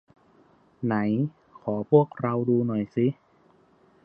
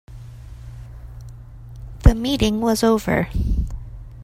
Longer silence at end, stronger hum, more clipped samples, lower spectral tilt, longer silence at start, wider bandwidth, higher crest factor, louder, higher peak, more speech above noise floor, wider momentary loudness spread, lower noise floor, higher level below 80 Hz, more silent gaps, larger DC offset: first, 0.9 s vs 0 s; neither; neither; first, -11.5 dB/octave vs -6 dB/octave; first, 0.8 s vs 0.1 s; second, 4.9 kHz vs 16 kHz; about the same, 20 dB vs 20 dB; second, -26 LUFS vs -20 LUFS; second, -6 dBFS vs 0 dBFS; first, 36 dB vs 19 dB; second, 11 LU vs 22 LU; first, -60 dBFS vs -38 dBFS; second, -66 dBFS vs -26 dBFS; neither; neither